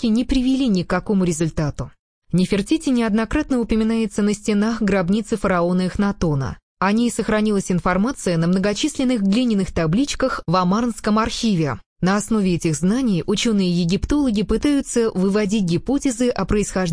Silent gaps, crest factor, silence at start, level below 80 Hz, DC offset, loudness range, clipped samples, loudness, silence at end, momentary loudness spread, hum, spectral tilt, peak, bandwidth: 1.99-2.22 s, 6.63-6.77 s, 11.86-11.96 s; 14 dB; 0 s; -36 dBFS; under 0.1%; 1 LU; under 0.1%; -20 LUFS; 0 s; 3 LU; none; -5.5 dB/octave; -4 dBFS; 10.5 kHz